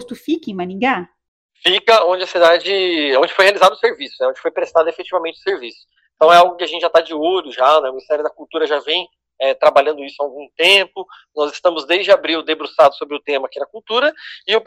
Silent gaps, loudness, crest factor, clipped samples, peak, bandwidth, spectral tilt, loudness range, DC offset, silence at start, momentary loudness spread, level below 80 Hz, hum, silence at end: 1.28-1.49 s; -15 LUFS; 16 dB; under 0.1%; 0 dBFS; 15.5 kHz; -3 dB/octave; 3 LU; under 0.1%; 0 s; 13 LU; -64 dBFS; none; 0.05 s